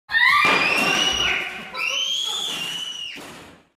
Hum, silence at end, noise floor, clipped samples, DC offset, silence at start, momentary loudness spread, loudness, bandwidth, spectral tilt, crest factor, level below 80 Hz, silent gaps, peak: none; 0.3 s; -43 dBFS; under 0.1%; under 0.1%; 0.1 s; 15 LU; -19 LUFS; 15.5 kHz; -0.5 dB/octave; 16 dB; -52 dBFS; none; -8 dBFS